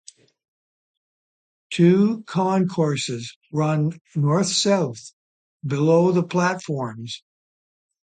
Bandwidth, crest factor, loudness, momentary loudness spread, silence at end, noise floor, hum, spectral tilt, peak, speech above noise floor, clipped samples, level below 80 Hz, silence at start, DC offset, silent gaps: 9.4 kHz; 16 dB; -21 LUFS; 14 LU; 1 s; under -90 dBFS; none; -5.5 dB/octave; -6 dBFS; over 69 dB; under 0.1%; -66 dBFS; 1.7 s; under 0.1%; 3.36-3.41 s, 4.01-4.05 s, 5.13-5.59 s